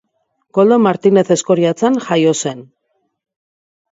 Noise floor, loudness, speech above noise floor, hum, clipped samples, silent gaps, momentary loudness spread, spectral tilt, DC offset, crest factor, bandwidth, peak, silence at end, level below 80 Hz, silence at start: -66 dBFS; -14 LUFS; 54 dB; none; under 0.1%; none; 9 LU; -5.5 dB/octave; under 0.1%; 16 dB; 8 kHz; 0 dBFS; 1.3 s; -64 dBFS; 0.55 s